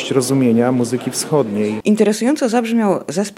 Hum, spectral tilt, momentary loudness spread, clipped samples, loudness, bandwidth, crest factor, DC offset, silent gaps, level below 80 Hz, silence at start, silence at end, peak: none; -5.5 dB/octave; 5 LU; under 0.1%; -16 LUFS; 16 kHz; 14 dB; under 0.1%; none; -64 dBFS; 0 s; 0.05 s; -2 dBFS